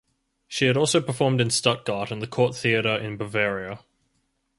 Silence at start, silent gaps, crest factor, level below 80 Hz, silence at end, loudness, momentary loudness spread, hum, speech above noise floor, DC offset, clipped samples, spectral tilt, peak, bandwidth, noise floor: 0.5 s; none; 22 dB; -60 dBFS; 0.8 s; -23 LUFS; 10 LU; none; 48 dB; under 0.1%; under 0.1%; -4 dB/octave; -4 dBFS; 11.5 kHz; -72 dBFS